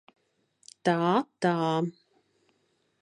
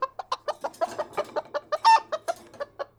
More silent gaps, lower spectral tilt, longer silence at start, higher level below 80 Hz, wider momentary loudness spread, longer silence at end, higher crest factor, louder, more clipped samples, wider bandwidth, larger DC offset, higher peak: neither; first, -6.5 dB/octave vs -1.5 dB/octave; first, 0.85 s vs 0 s; second, -78 dBFS vs -70 dBFS; second, 6 LU vs 16 LU; first, 1.1 s vs 0.15 s; about the same, 20 dB vs 20 dB; about the same, -28 LUFS vs -27 LUFS; neither; second, 11 kHz vs 14.5 kHz; neither; about the same, -10 dBFS vs -8 dBFS